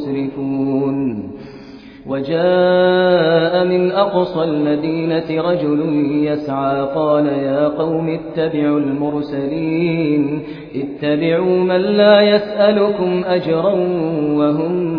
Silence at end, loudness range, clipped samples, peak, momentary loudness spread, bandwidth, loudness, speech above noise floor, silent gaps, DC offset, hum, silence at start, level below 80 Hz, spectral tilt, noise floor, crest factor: 0 s; 4 LU; under 0.1%; 0 dBFS; 9 LU; 5.2 kHz; -16 LUFS; 21 dB; none; under 0.1%; none; 0 s; -52 dBFS; -9.5 dB/octave; -36 dBFS; 16 dB